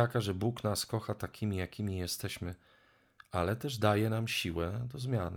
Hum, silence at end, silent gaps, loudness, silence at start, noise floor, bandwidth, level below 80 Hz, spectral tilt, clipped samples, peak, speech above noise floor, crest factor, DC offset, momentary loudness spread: none; 0 s; none; -35 LUFS; 0 s; -63 dBFS; 19 kHz; -56 dBFS; -5.5 dB/octave; under 0.1%; -14 dBFS; 29 dB; 20 dB; under 0.1%; 9 LU